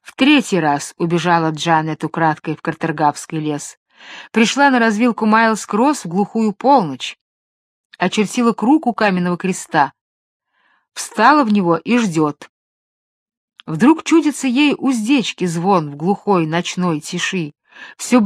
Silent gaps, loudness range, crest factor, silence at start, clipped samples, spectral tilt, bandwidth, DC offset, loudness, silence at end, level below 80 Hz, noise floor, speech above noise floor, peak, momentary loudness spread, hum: 3.77-3.86 s, 7.21-7.90 s, 10.01-10.40 s, 12.49-13.26 s, 13.37-13.48 s; 3 LU; 16 dB; 0.05 s; under 0.1%; -5 dB/octave; 14 kHz; under 0.1%; -16 LUFS; 0 s; -66 dBFS; under -90 dBFS; over 74 dB; 0 dBFS; 11 LU; none